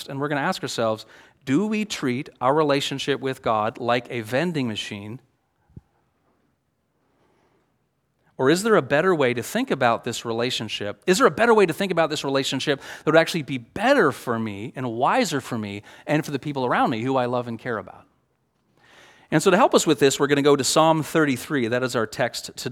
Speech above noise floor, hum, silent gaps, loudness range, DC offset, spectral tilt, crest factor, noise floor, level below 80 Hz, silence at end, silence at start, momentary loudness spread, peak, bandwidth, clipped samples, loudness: 49 dB; none; none; 7 LU; under 0.1%; -4.5 dB/octave; 22 dB; -71 dBFS; -64 dBFS; 0 s; 0 s; 12 LU; 0 dBFS; 17.5 kHz; under 0.1%; -22 LUFS